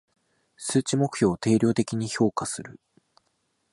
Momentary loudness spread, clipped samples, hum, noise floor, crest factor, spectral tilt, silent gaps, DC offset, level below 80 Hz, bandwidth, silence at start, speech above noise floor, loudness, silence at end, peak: 12 LU; under 0.1%; none; -73 dBFS; 18 dB; -5.5 dB/octave; none; under 0.1%; -60 dBFS; 11.5 kHz; 0.6 s; 49 dB; -25 LUFS; 0.95 s; -8 dBFS